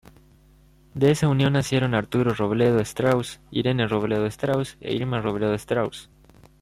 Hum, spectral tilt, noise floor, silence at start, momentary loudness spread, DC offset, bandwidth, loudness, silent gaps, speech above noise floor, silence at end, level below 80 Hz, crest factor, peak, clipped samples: none; -6.5 dB/octave; -54 dBFS; 0.95 s; 7 LU; under 0.1%; 15.5 kHz; -23 LUFS; none; 32 dB; 0.6 s; -52 dBFS; 16 dB; -8 dBFS; under 0.1%